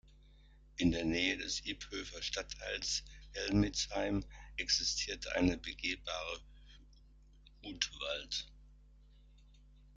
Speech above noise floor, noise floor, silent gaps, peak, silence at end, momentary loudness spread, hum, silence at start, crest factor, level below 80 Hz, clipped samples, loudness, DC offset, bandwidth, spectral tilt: 24 dB; -61 dBFS; none; -14 dBFS; 0.05 s; 11 LU; none; 0.05 s; 24 dB; -52 dBFS; under 0.1%; -37 LUFS; under 0.1%; 9.4 kHz; -3.5 dB/octave